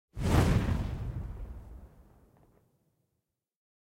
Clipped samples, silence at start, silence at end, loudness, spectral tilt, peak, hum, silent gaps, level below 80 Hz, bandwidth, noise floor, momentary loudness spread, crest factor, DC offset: under 0.1%; 0.15 s; 1.95 s; -31 LUFS; -6.5 dB/octave; -12 dBFS; none; none; -40 dBFS; 16.5 kHz; -84 dBFS; 23 LU; 22 dB; under 0.1%